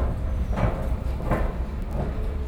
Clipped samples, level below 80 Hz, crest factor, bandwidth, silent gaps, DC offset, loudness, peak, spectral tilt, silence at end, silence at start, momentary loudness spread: under 0.1%; -26 dBFS; 16 dB; 12 kHz; none; under 0.1%; -28 LUFS; -10 dBFS; -8.5 dB/octave; 0 s; 0 s; 4 LU